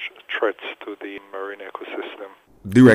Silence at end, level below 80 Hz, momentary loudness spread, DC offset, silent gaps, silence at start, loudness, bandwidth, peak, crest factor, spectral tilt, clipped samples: 0 s; -62 dBFS; 16 LU; under 0.1%; none; 0 s; -25 LUFS; 10.5 kHz; -2 dBFS; 18 dB; -7 dB/octave; under 0.1%